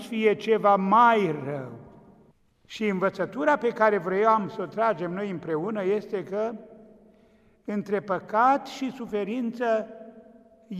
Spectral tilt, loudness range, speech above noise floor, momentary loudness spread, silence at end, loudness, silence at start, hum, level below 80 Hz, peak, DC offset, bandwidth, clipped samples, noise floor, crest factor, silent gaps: -6.5 dB/octave; 6 LU; 35 dB; 13 LU; 0 s; -25 LUFS; 0 s; none; -70 dBFS; -8 dBFS; under 0.1%; 12.5 kHz; under 0.1%; -60 dBFS; 18 dB; none